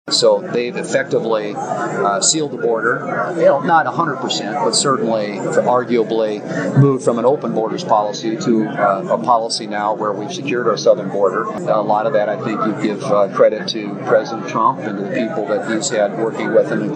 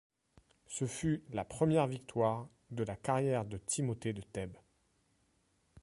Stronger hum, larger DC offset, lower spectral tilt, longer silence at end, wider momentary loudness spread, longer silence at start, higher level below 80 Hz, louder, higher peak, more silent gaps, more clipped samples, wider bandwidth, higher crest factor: neither; neither; second, -4.5 dB/octave vs -6 dB/octave; second, 0 s vs 1.3 s; second, 7 LU vs 12 LU; second, 0.05 s vs 0.7 s; second, -72 dBFS vs -62 dBFS; first, -17 LUFS vs -36 LUFS; first, 0 dBFS vs -18 dBFS; neither; neither; second, 9.4 kHz vs 11.5 kHz; about the same, 16 dB vs 20 dB